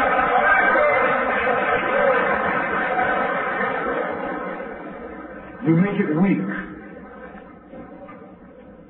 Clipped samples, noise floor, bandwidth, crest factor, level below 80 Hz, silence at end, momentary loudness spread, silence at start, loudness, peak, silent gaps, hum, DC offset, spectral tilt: under 0.1%; -43 dBFS; 4.2 kHz; 16 dB; -50 dBFS; 0.05 s; 23 LU; 0 s; -20 LUFS; -4 dBFS; none; none; under 0.1%; -10.5 dB/octave